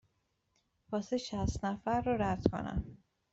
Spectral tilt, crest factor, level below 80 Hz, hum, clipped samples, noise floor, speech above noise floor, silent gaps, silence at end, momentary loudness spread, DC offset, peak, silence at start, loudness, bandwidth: -6.5 dB/octave; 26 dB; -50 dBFS; none; under 0.1%; -79 dBFS; 44 dB; none; 0.35 s; 8 LU; under 0.1%; -12 dBFS; 0.9 s; -35 LUFS; 8 kHz